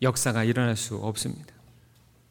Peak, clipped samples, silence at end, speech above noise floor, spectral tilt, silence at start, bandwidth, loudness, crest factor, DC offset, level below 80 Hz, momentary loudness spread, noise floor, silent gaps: -10 dBFS; under 0.1%; 0.85 s; 32 dB; -4.5 dB/octave; 0 s; 19 kHz; -27 LUFS; 18 dB; under 0.1%; -60 dBFS; 9 LU; -58 dBFS; none